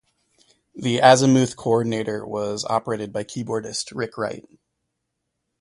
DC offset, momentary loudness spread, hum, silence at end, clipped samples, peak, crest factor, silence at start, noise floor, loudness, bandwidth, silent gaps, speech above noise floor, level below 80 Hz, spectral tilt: under 0.1%; 14 LU; none; 1.2 s; under 0.1%; 0 dBFS; 22 dB; 0.75 s; -78 dBFS; -21 LUFS; 11.5 kHz; none; 57 dB; -60 dBFS; -5 dB/octave